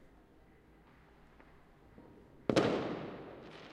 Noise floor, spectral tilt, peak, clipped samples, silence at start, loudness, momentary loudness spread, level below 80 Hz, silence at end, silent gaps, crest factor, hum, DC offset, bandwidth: -62 dBFS; -6 dB/octave; -14 dBFS; under 0.1%; 0 s; -36 LUFS; 27 LU; -66 dBFS; 0 s; none; 26 dB; none; under 0.1%; 12.5 kHz